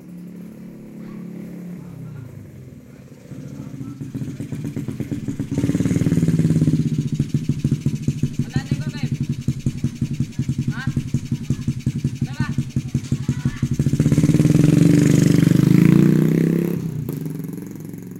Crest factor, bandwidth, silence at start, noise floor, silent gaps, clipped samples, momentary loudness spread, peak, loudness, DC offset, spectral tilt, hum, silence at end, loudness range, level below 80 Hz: 20 dB; 16 kHz; 0 s; -41 dBFS; none; under 0.1%; 21 LU; 0 dBFS; -20 LUFS; under 0.1%; -7.5 dB/octave; none; 0 s; 18 LU; -42 dBFS